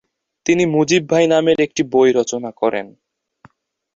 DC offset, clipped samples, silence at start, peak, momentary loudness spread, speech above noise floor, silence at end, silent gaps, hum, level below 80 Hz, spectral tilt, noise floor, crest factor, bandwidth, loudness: under 0.1%; under 0.1%; 0.45 s; -2 dBFS; 7 LU; 39 dB; 1.05 s; none; none; -58 dBFS; -5 dB/octave; -54 dBFS; 16 dB; 7.8 kHz; -16 LUFS